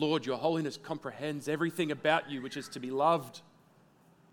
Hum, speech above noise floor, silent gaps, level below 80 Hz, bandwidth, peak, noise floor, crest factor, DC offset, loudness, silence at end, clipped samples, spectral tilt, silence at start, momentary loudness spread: none; 31 dB; none; -80 dBFS; 19 kHz; -12 dBFS; -63 dBFS; 22 dB; under 0.1%; -33 LUFS; 0.9 s; under 0.1%; -5.5 dB/octave; 0 s; 11 LU